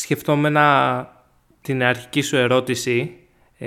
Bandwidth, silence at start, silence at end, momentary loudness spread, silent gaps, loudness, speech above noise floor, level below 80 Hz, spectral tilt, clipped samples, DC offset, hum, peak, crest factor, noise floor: 18 kHz; 0 s; 0 s; 12 LU; none; -19 LUFS; 33 dB; -60 dBFS; -5 dB/octave; under 0.1%; under 0.1%; none; 0 dBFS; 20 dB; -51 dBFS